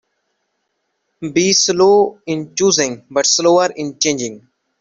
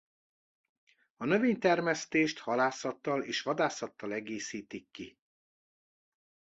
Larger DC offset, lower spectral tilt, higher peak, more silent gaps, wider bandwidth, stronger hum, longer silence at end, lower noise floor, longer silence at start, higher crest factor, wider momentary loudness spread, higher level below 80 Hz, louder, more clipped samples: neither; second, -2.5 dB/octave vs -4.5 dB/octave; first, -2 dBFS vs -14 dBFS; neither; about the same, 7.8 kHz vs 8.2 kHz; neither; second, 0.45 s vs 1.5 s; second, -70 dBFS vs under -90 dBFS; about the same, 1.2 s vs 1.2 s; second, 14 dB vs 20 dB; second, 11 LU vs 16 LU; first, -58 dBFS vs -76 dBFS; first, -14 LUFS vs -32 LUFS; neither